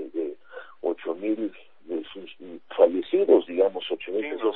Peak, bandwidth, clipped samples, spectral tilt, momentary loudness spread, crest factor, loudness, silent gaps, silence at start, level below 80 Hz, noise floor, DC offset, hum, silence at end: -6 dBFS; 4.1 kHz; under 0.1%; -8.5 dB/octave; 21 LU; 20 dB; -25 LUFS; none; 0 s; -74 dBFS; -45 dBFS; 0.3%; none; 0 s